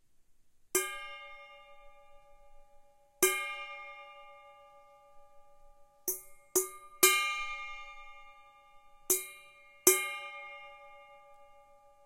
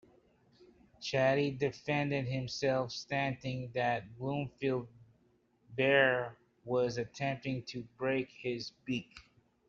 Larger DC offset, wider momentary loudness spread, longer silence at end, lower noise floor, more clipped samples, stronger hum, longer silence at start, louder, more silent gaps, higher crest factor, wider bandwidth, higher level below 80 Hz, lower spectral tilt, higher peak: neither; first, 27 LU vs 11 LU; about the same, 0.55 s vs 0.45 s; second, -62 dBFS vs -71 dBFS; neither; neither; second, 0.75 s vs 1 s; first, -31 LUFS vs -34 LUFS; neither; first, 32 dB vs 22 dB; first, 16 kHz vs 7.6 kHz; about the same, -64 dBFS vs -68 dBFS; second, 0.5 dB/octave vs -4 dB/octave; first, -6 dBFS vs -14 dBFS